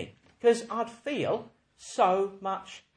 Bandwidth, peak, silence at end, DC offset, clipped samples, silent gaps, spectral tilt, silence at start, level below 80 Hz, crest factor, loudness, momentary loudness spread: 10 kHz; -12 dBFS; 0.2 s; under 0.1%; under 0.1%; none; -4.5 dB/octave; 0 s; -72 dBFS; 18 dB; -29 LUFS; 12 LU